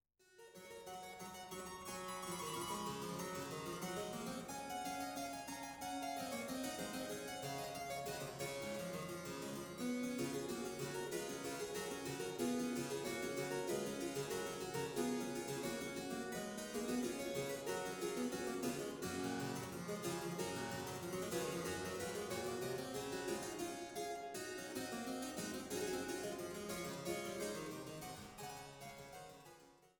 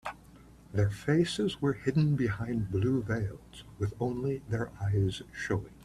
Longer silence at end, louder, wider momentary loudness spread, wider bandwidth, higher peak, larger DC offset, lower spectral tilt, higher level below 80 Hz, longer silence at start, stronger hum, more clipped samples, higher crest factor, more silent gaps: about the same, 0.1 s vs 0 s; second, -44 LUFS vs -31 LUFS; about the same, 8 LU vs 9 LU; first, 18 kHz vs 12.5 kHz; second, -26 dBFS vs -14 dBFS; neither; second, -4 dB/octave vs -7 dB/octave; second, -72 dBFS vs -54 dBFS; first, 0.3 s vs 0.05 s; neither; neither; about the same, 18 dB vs 18 dB; neither